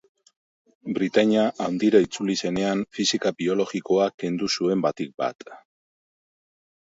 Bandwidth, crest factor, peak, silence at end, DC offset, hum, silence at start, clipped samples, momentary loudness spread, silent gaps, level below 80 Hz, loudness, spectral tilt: 8 kHz; 20 dB; -4 dBFS; 1.25 s; under 0.1%; none; 0.85 s; under 0.1%; 9 LU; 4.14-4.18 s; -64 dBFS; -24 LUFS; -4.5 dB/octave